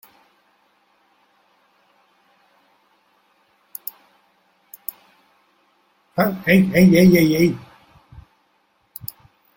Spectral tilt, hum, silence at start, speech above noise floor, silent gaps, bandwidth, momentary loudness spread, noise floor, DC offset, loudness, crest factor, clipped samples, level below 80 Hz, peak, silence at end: -7 dB/octave; none; 6.15 s; 50 dB; none; 17 kHz; 22 LU; -64 dBFS; under 0.1%; -15 LUFS; 20 dB; under 0.1%; -52 dBFS; -2 dBFS; 2 s